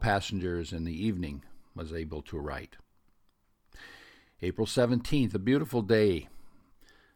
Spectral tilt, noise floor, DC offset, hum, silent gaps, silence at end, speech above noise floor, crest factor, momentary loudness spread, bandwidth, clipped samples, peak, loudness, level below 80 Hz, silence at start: -6.5 dB/octave; -69 dBFS; under 0.1%; none; none; 0.6 s; 39 dB; 20 dB; 23 LU; 19 kHz; under 0.1%; -12 dBFS; -31 LUFS; -48 dBFS; 0 s